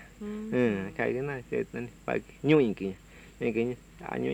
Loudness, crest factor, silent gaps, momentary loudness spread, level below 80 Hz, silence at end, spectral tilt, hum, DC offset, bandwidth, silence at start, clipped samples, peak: -31 LUFS; 20 dB; none; 14 LU; -56 dBFS; 0 s; -7.5 dB/octave; none; under 0.1%; 13.5 kHz; 0 s; under 0.1%; -10 dBFS